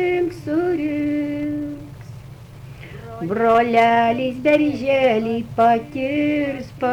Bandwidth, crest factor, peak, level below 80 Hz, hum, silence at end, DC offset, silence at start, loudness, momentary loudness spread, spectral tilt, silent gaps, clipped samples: 13.5 kHz; 14 dB; -6 dBFS; -48 dBFS; none; 0 s; under 0.1%; 0 s; -19 LUFS; 22 LU; -7 dB/octave; none; under 0.1%